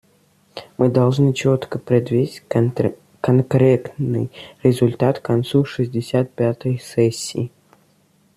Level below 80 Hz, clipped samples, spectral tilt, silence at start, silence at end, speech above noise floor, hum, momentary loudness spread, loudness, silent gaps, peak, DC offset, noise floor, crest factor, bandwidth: -56 dBFS; under 0.1%; -7.5 dB/octave; 0.55 s; 0.9 s; 40 dB; none; 10 LU; -19 LUFS; none; -2 dBFS; under 0.1%; -58 dBFS; 18 dB; 14 kHz